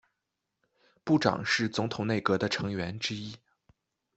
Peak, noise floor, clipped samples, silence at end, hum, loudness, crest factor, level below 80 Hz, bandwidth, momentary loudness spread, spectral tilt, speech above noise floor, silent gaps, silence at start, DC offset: -8 dBFS; -85 dBFS; under 0.1%; 0.8 s; none; -29 LUFS; 24 dB; -64 dBFS; 8.2 kHz; 10 LU; -5 dB/octave; 55 dB; none; 1.05 s; under 0.1%